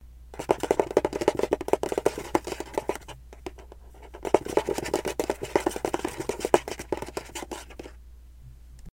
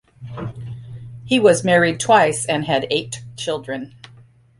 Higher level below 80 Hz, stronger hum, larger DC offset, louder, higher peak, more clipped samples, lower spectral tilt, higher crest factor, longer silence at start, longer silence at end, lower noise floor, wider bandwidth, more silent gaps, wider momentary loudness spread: first, -48 dBFS vs -54 dBFS; neither; neither; second, -29 LUFS vs -17 LUFS; about the same, 0 dBFS vs -2 dBFS; neither; about the same, -4.5 dB/octave vs -4 dB/octave; first, 30 dB vs 18 dB; second, 0 s vs 0.2 s; second, 0.1 s vs 0.7 s; about the same, -47 dBFS vs -48 dBFS; first, 17 kHz vs 11.5 kHz; neither; about the same, 20 LU vs 21 LU